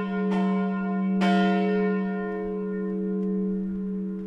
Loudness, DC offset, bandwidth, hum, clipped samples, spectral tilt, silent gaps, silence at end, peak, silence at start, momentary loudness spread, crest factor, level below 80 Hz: -26 LUFS; under 0.1%; 6 kHz; none; under 0.1%; -8.5 dB/octave; none; 0 s; -12 dBFS; 0 s; 8 LU; 14 dB; -56 dBFS